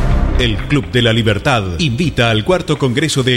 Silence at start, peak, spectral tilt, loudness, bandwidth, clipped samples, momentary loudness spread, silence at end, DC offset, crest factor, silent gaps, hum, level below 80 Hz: 0 s; -2 dBFS; -5.5 dB/octave; -14 LUFS; 13.5 kHz; under 0.1%; 3 LU; 0 s; under 0.1%; 12 dB; none; none; -22 dBFS